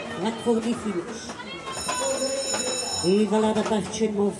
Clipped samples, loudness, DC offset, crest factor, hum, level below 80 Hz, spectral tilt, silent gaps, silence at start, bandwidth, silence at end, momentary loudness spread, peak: under 0.1%; -25 LUFS; under 0.1%; 14 dB; none; -60 dBFS; -3.5 dB/octave; none; 0 s; 11.5 kHz; 0 s; 11 LU; -10 dBFS